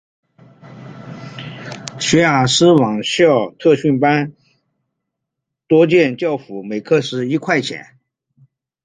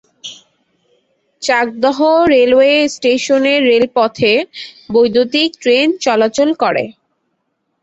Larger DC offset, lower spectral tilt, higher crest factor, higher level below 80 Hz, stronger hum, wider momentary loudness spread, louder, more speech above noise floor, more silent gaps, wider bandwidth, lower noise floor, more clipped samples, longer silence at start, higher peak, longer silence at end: neither; first, -5 dB/octave vs -3.5 dB/octave; about the same, 16 dB vs 14 dB; about the same, -56 dBFS vs -52 dBFS; neither; first, 19 LU vs 12 LU; second, -15 LUFS vs -12 LUFS; first, 65 dB vs 56 dB; neither; first, 9.6 kHz vs 8.2 kHz; first, -79 dBFS vs -68 dBFS; neither; first, 0.65 s vs 0.25 s; about the same, -2 dBFS vs 0 dBFS; first, 1.05 s vs 0.9 s